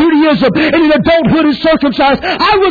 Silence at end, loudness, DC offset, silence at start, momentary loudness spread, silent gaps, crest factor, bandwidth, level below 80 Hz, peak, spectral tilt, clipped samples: 0 s; -9 LUFS; under 0.1%; 0 s; 2 LU; none; 8 dB; 4.9 kHz; -36 dBFS; 0 dBFS; -7.5 dB/octave; under 0.1%